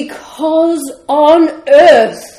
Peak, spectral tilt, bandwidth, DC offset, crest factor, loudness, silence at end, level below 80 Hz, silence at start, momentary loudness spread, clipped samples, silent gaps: 0 dBFS; -3.5 dB/octave; 15.5 kHz; under 0.1%; 10 dB; -9 LUFS; 0.1 s; -52 dBFS; 0 s; 14 LU; 0.8%; none